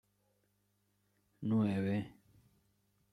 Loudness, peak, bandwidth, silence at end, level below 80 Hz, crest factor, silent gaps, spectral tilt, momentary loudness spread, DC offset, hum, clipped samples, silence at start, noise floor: -36 LUFS; -22 dBFS; 10.5 kHz; 1 s; -76 dBFS; 18 dB; none; -9 dB/octave; 12 LU; under 0.1%; 50 Hz at -55 dBFS; under 0.1%; 1.4 s; -78 dBFS